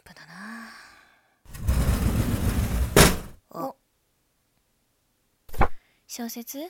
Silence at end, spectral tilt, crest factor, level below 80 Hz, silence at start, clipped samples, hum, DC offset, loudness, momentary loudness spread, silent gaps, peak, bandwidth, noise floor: 0 s; -4.5 dB/octave; 26 dB; -32 dBFS; 0.2 s; under 0.1%; none; under 0.1%; -25 LUFS; 25 LU; none; -2 dBFS; 17.5 kHz; -70 dBFS